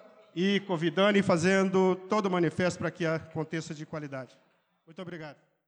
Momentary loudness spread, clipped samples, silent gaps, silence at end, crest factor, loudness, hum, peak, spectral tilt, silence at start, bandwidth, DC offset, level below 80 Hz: 18 LU; under 0.1%; none; 0.35 s; 16 dB; -28 LUFS; none; -14 dBFS; -6 dB/octave; 0.35 s; 9.8 kHz; under 0.1%; -70 dBFS